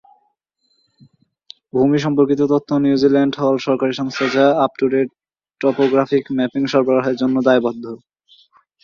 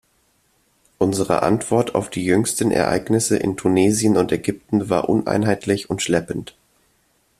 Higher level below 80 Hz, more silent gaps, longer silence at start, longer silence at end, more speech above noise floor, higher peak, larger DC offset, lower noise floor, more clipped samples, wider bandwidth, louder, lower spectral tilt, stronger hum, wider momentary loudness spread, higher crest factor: second, -62 dBFS vs -52 dBFS; neither; first, 1.75 s vs 1 s; about the same, 0.85 s vs 0.95 s; first, 50 dB vs 44 dB; about the same, -2 dBFS vs -2 dBFS; neither; about the same, -66 dBFS vs -63 dBFS; neither; second, 7.2 kHz vs 15 kHz; first, -17 LUFS vs -20 LUFS; first, -6.5 dB/octave vs -5 dB/octave; neither; about the same, 6 LU vs 5 LU; about the same, 16 dB vs 18 dB